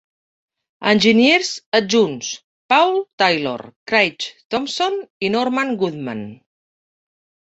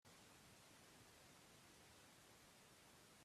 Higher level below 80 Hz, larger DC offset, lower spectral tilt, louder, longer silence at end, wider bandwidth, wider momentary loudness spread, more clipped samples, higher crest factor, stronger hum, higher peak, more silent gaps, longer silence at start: first, -62 dBFS vs -86 dBFS; neither; about the same, -3.5 dB/octave vs -2.5 dB/octave; first, -18 LUFS vs -66 LUFS; first, 1.1 s vs 0 s; second, 8.2 kHz vs 15 kHz; first, 15 LU vs 1 LU; neither; about the same, 18 dB vs 14 dB; neither; first, 0 dBFS vs -54 dBFS; first, 1.66-1.72 s, 2.44-2.69 s, 3.13-3.18 s, 3.76-3.86 s, 4.45-4.50 s, 5.10-5.20 s vs none; first, 0.8 s vs 0.05 s